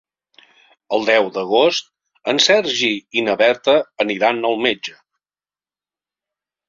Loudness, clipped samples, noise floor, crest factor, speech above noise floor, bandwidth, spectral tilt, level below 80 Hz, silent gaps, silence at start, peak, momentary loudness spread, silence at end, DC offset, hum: -17 LUFS; under 0.1%; under -90 dBFS; 18 dB; over 73 dB; 7.6 kHz; -2.5 dB/octave; -66 dBFS; none; 0.9 s; -2 dBFS; 9 LU; 1.8 s; under 0.1%; 50 Hz at -65 dBFS